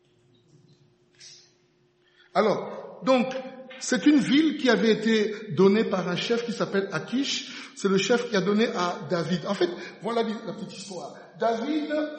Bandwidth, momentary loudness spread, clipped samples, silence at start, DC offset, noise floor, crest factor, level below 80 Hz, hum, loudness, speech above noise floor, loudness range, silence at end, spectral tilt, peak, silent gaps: 8.4 kHz; 15 LU; under 0.1%; 1.2 s; under 0.1%; -65 dBFS; 20 dB; -74 dBFS; none; -25 LUFS; 40 dB; 6 LU; 0 s; -5 dB/octave; -6 dBFS; none